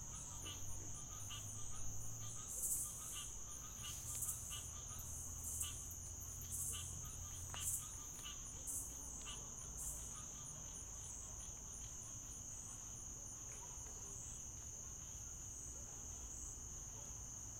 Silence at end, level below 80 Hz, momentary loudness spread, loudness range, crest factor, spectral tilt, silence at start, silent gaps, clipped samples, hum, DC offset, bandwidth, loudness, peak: 0 s; -60 dBFS; 6 LU; 4 LU; 22 dB; -2 dB/octave; 0 s; none; under 0.1%; none; under 0.1%; 16.5 kHz; -47 LUFS; -28 dBFS